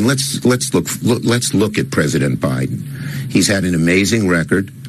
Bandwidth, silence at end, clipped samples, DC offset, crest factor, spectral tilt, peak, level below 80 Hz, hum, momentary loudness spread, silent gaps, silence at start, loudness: 13.5 kHz; 0 s; under 0.1%; under 0.1%; 16 dB; -4.5 dB/octave; 0 dBFS; -44 dBFS; none; 6 LU; none; 0 s; -16 LUFS